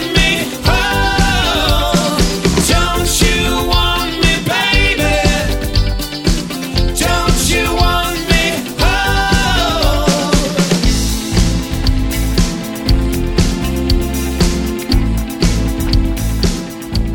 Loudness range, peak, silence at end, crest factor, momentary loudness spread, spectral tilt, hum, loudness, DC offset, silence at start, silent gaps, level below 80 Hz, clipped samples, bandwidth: 3 LU; 0 dBFS; 0 s; 14 dB; 5 LU; -4 dB/octave; none; -14 LUFS; 0.4%; 0 s; none; -18 dBFS; under 0.1%; 19 kHz